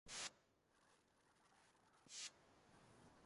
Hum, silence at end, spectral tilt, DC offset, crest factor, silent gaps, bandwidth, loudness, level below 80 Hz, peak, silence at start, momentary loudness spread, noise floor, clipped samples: none; 0 s; 0 dB/octave; under 0.1%; 26 dB; none; 11.5 kHz; -54 LUFS; -84 dBFS; -36 dBFS; 0.05 s; 18 LU; -79 dBFS; under 0.1%